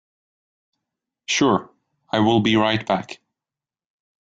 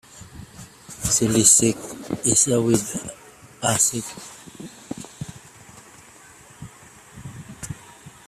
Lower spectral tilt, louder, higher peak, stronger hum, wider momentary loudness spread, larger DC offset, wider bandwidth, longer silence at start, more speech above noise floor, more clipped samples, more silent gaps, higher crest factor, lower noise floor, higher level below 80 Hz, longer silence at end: first, -4.5 dB/octave vs -3 dB/octave; about the same, -20 LUFS vs -19 LUFS; about the same, -4 dBFS vs -2 dBFS; neither; second, 20 LU vs 27 LU; neither; second, 7.8 kHz vs 16 kHz; first, 1.3 s vs 0.15 s; first, over 71 dB vs 27 dB; neither; neither; about the same, 20 dB vs 24 dB; first, under -90 dBFS vs -47 dBFS; second, -58 dBFS vs -52 dBFS; first, 1.1 s vs 0.2 s